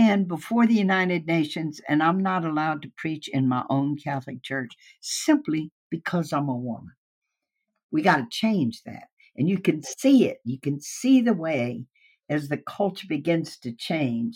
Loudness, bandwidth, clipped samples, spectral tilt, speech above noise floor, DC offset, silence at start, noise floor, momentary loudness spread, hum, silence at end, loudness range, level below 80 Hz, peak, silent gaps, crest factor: -25 LUFS; 16.5 kHz; under 0.1%; -5.5 dB/octave; 57 dB; under 0.1%; 0 s; -81 dBFS; 12 LU; none; 0 s; 4 LU; -74 dBFS; -6 dBFS; 5.72-5.90 s, 6.98-7.22 s, 7.83-7.89 s, 9.13-9.17 s; 18 dB